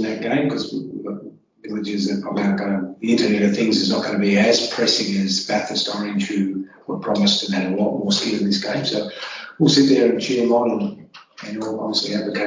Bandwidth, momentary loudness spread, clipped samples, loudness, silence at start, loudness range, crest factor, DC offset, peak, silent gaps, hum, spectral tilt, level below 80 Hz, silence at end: 7.6 kHz; 13 LU; under 0.1%; -20 LUFS; 0 s; 3 LU; 18 dB; under 0.1%; -2 dBFS; none; none; -4.5 dB/octave; -60 dBFS; 0 s